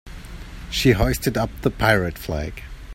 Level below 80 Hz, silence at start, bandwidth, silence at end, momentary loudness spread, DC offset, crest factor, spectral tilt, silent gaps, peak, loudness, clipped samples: -32 dBFS; 0.05 s; 16.5 kHz; 0 s; 20 LU; under 0.1%; 20 dB; -5.5 dB/octave; none; -2 dBFS; -21 LUFS; under 0.1%